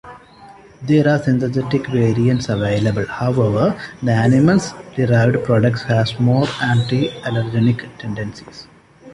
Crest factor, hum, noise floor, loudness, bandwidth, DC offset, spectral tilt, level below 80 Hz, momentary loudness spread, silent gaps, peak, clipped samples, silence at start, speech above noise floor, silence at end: 14 dB; none; -42 dBFS; -17 LUFS; 11 kHz; under 0.1%; -7.5 dB/octave; -46 dBFS; 12 LU; none; -2 dBFS; under 0.1%; 0.05 s; 26 dB; 0 s